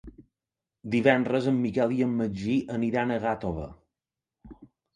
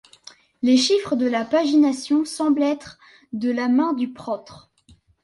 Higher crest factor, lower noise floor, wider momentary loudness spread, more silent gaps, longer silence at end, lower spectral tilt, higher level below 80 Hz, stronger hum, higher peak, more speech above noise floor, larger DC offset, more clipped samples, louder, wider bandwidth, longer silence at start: first, 22 dB vs 14 dB; first, -89 dBFS vs -56 dBFS; about the same, 11 LU vs 13 LU; neither; second, 0.3 s vs 0.65 s; first, -7.5 dB/octave vs -3.5 dB/octave; first, -54 dBFS vs -64 dBFS; neither; about the same, -6 dBFS vs -8 dBFS; first, 64 dB vs 35 dB; neither; neither; second, -27 LUFS vs -21 LUFS; second, 9.8 kHz vs 11.5 kHz; second, 0.05 s vs 0.65 s